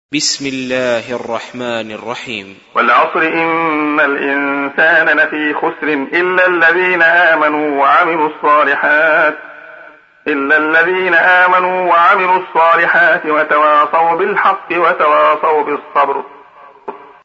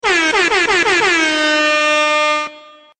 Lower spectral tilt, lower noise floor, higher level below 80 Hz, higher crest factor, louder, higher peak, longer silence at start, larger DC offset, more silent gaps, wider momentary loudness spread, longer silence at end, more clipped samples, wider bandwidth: first, -3 dB/octave vs -1 dB/octave; about the same, -40 dBFS vs -40 dBFS; second, -64 dBFS vs -50 dBFS; about the same, 12 dB vs 12 dB; about the same, -11 LUFS vs -13 LUFS; first, 0 dBFS vs -4 dBFS; about the same, 0.1 s vs 0.05 s; neither; neither; first, 12 LU vs 4 LU; second, 0.2 s vs 0.4 s; neither; second, 8 kHz vs 9.4 kHz